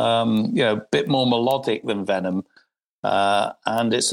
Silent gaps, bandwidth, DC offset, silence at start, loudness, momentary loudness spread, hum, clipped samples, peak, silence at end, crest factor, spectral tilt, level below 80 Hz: 2.89-3.03 s; 16.5 kHz; under 0.1%; 0 s; -21 LUFS; 5 LU; none; under 0.1%; -4 dBFS; 0 s; 18 dB; -4.5 dB/octave; -64 dBFS